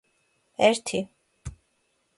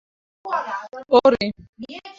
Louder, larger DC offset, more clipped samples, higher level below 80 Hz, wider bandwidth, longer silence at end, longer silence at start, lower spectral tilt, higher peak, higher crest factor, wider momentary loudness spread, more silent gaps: second, -24 LUFS vs -20 LUFS; neither; neither; about the same, -54 dBFS vs -56 dBFS; first, 11.5 kHz vs 7.4 kHz; first, 0.65 s vs 0.05 s; first, 0.6 s vs 0.45 s; second, -3.5 dB/octave vs -5.5 dB/octave; second, -6 dBFS vs -2 dBFS; about the same, 24 dB vs 20 dB; about the same, 22 LU vs 22 LU; second, none vs 1.69-1.73 s